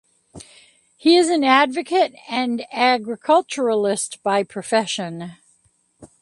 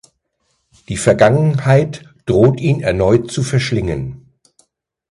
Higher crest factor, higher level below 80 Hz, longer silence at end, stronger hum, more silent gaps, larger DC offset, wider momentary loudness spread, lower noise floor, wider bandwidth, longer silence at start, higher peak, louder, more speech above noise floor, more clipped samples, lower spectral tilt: about the same, 20 dB vs 16 dB; second, -66 dBFS vs -38 dBFS; second, 0.15 s vs 0.95 s; neither; neither; neither; second, 10 LU vs 13 LU; second, -62 dBFS vs -66 dBFS; about the same, 11.5 kHz vs 11.5 kHz; second, 0.35 s vs 0.9 s; about the same, 0 dBFS vs 0 dBFS; second, -19 LUFS vs -15 LUFS; second, 43 dB vs 53 dB; neither; second, -3.5 dB/octave vs -6.5 dB/octave